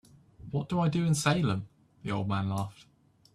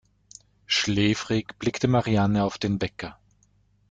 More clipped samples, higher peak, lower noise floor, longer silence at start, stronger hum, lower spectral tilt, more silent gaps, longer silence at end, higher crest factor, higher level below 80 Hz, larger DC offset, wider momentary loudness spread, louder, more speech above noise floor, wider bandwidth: neither; second, -14 dBFS vs -8 dBFS; second, -50 dBFS vs -64 dBFS; second, 0.4 s vs 0.7 s; second, none vs 50 Hz at -40 dBFS; about the same, -5.5 dB/octave vs -5 dB/octave; neither; second, 0.65 s vs 0.8 s; about the same, 18 dB vs 18 dB; second, -60 dBFS vs -52 dBFS; neither; first, 15 LU vs 9 LU; second, -30 LUFS vs -25 LUFS; second, 21 dB vs 39 dB; first, 13.5 kHz vs 9.2 kHz